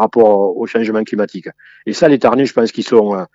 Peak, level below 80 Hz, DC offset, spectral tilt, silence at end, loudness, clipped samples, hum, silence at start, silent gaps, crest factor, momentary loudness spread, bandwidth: 0 dBFS; -58 dBFS; under 0.1%; -6 dB/octave; 0.1 s; -14 LUFS; under 0.1%; none; 0 s; none; 14 dB; 14 LU; 7.8 kHz